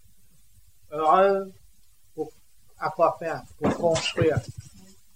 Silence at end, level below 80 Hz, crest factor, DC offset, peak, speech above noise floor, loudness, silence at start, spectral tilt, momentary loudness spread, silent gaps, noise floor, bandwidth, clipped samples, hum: 0.55 s; -56 dBFS; 20 dB; 0.2%; -6 dBFS; 37 dB; -25 LUFS; 0.9 s; -5 dB/octave; 20 LU; none; -61 dBFS; 16 kHz; under 0.1%; none